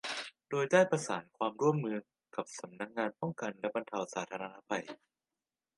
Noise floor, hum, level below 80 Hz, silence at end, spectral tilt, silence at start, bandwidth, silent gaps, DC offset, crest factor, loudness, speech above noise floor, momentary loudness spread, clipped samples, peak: under -90 dBFS; none; -84 dBFS; 0.8 s; -5 dB/octave; 0.05 s; 11.5 kHz; none; under 0.1%; 24 dB; -35 LUFS; over 55 dB; 15 LU; under 0.1%; -12 dBFS